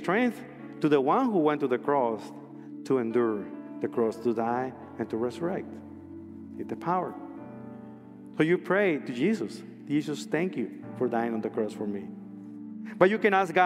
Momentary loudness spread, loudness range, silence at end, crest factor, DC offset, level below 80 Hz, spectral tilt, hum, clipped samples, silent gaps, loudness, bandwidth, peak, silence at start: 19 LU; 6 LU; 0 s; 24 dB; under 0.1%; -74 dBFS; -6.5 dB/octave; none; under 0.1%; none; -28 LUFS; 13.5 kHz; -6 dBFS; 0 s